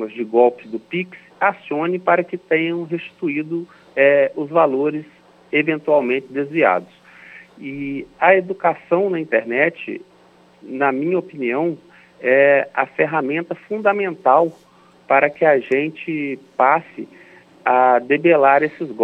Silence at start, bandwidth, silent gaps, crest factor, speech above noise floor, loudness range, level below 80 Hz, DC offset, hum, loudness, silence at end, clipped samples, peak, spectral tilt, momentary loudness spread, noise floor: 0 s; 5.6 kHz; none; 18 dB; 33 dB; 3 LU; -68 dBFS; under 0.1%; none; -18 LUFS; 0 s; under 0.1%; 0 dBFS; -8 dB/octave; 13 LU; -51 dBFS